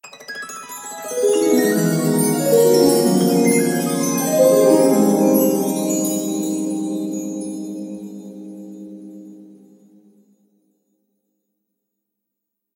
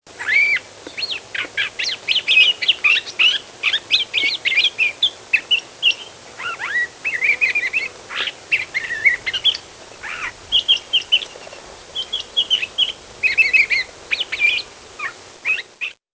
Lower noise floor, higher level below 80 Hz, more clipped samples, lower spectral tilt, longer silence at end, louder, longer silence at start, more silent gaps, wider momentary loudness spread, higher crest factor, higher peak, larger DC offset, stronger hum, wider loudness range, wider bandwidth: first, -80 dBFS vs -38 dBFS; second, -68 dBFS vs -56 dBFS; neither; first, -5 dB/octave vs 0.5 dB/octave; first, 3.3 s vs 0.3 s; about the same, -17 LUFS vs -17 LUFS; about the same, 0.05 s vs 0.1 s; neither; first, 22 LU vs 15 LU; about the same, 18 dB vs 18 dB; about the same, -2 dBFS vs -2 dBFS; neither; neither; first, 17 LU vs 4 LU; first, 16 kHz vs 8 kHz